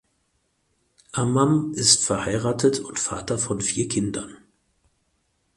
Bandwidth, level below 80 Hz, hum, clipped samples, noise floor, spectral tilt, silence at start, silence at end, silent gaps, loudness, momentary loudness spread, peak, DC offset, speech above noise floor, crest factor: 11.5 kHz; -52 dBFS; none; under 0.1%; -70 dBFS; -3.5 dB/octave; 1.15 s; 1.2 s; none; -22 LUFS; 11 LU; -2 dBFS; under 0.1%; 47 dB; 22 dB